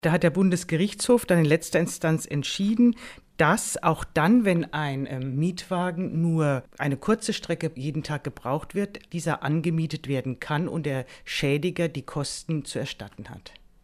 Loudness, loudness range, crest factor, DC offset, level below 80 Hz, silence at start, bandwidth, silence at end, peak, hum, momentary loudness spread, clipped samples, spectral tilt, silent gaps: -26 LUFS; 5 LU; 20 dB; under 0.1%; -54 dBFS; 0.05 s; 15.5 kHz; 0.35 s; -6 dBFS; none; 11 LU; under 0.1%; -5.5 dB/octave; none